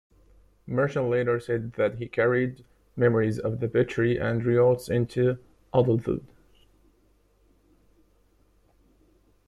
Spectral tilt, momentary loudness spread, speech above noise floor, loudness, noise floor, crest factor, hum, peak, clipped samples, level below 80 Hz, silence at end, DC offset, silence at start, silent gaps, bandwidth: -8 dB/octave; 9 LU; 39 dB; -26 LUFS; -64 dBFS; 18 dB; none; -8 dBFS; under 0.1%; -56 dBFS; 3.2 s; under 0.1%; 0.65 s; none; 13 kHz